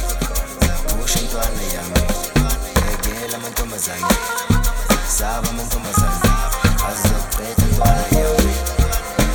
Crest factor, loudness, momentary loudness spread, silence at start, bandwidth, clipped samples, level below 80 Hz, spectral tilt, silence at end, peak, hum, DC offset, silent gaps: 18 dB; -19 LUFS; 6 LU; 0 s; 19.5 kHz; under 0.1%; -20 dBFS; -4 dB/octave; 0 s; 0 dBFS; none; under 0.1%; none